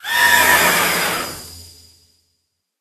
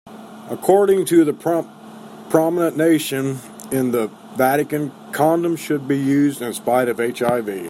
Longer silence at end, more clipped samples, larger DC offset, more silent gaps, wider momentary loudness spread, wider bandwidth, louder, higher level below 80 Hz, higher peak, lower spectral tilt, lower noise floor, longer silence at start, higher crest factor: first, 1.15 s vs 0 s; neither; neither; neither; first, 20 LU vs 15 LU; second, 13.5 kHz vs 16.5 kHz; first, -13 LUFS vs -19 LUFS; first, -50 dBFS vs -64 dBFS; about the same, 0 dBFS vs -2 dBFS; second, -0.5 dB/octave vs -5.5 dB/octave; first, -71 dBFS vs -38 dBFS; about the same, 0.05 s vs 0.05 s; about the same, 18 dB vs 18 dB